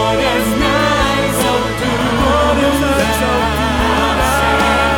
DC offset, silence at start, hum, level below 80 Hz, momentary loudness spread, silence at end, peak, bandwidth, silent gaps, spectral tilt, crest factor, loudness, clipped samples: under 0.1%; 0 s; none; -24 dBFS; 3 LU; 0 s; 0 dBFS; 19.5 kHz; none; -4.5 dB/octave; 14 dB; -14 LUFS; under 0.1%